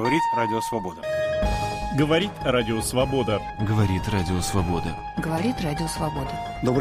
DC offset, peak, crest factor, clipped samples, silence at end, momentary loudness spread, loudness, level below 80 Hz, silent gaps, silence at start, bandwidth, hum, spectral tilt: under 0.1%; -8 dBFS; 16 dB; under 0.1%; 0 s; 7 LU; -25 LUFS; -38 dBFS; none; 0 s; 15.5 kHz; none; -5.5 dB/octave